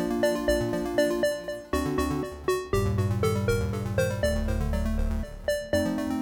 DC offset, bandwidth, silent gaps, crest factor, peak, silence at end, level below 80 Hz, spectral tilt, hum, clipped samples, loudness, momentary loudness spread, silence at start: under 0.1%; 19 kHz; none; 16 dB; -10 dBFS; 0 s; -34 dBFS; -6 dB/octave; none; under 0.1%; -28 LUFS; 5 LU; 0 s